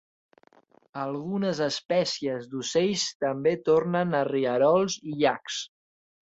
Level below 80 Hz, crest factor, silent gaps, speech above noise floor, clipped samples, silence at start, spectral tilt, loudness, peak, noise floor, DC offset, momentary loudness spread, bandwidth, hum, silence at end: -68 dBFS; 18 dB; 3.15-3.20 s; 34 dB; under 0.1%; 0.95 s; -4.5 dB/octave; -26 LUFS; -8 dBFS; -60 dBFS; under 0.1%; 11 LU; 8 kHz; none; 0.55 s